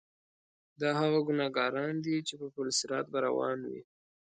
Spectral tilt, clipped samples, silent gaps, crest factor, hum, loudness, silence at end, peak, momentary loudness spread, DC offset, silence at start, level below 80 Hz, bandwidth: -4 dB/octave; under 0.1%; none; 18 dB; none; -32 LUFS; 0.4 s; -16 dBFS; 10 LU; under 0.1%; 0.8 s; -80 dBFS; 9.4 kHz